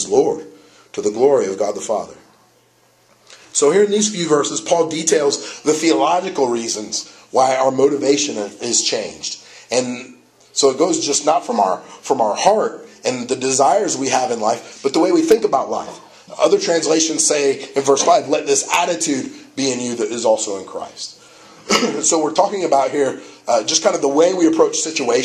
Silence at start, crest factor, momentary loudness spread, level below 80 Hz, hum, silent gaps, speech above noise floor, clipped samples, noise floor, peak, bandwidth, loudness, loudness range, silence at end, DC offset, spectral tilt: 0 s; 18 dB; 10 LU; -64 dBFS; none; none; 38 dB; under 0.1%; -55 dBFS; 0 dBFS; 13.5 kHz; -17 LUFS; 3 LU; 0 s; under 0.1%; -2.5 dB/octave